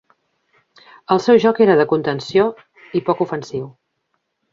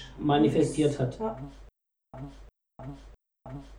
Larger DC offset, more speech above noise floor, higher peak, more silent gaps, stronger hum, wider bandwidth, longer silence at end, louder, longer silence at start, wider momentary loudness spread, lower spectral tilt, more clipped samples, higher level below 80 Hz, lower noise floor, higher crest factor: neither; first, 55 dB vs 30 dB; first, -2 dBFS vs -12 dBFS; neither; neither; second, 7.4 kHz vs 11 kHz; first, 0.85 s vs 0 s; first, -17 LUFS vs -27 LUFS; first, 1.1 s vs 0 s; second, 14 LU vs 22 LU; about the same, -6.5 dB/octave vs -6.5 dB/octave; neither; second, -62 dBFS vs -50 dBFS; first, -71 dBFS vs -58 dBFS; about the same, 18 dB vs 18 dB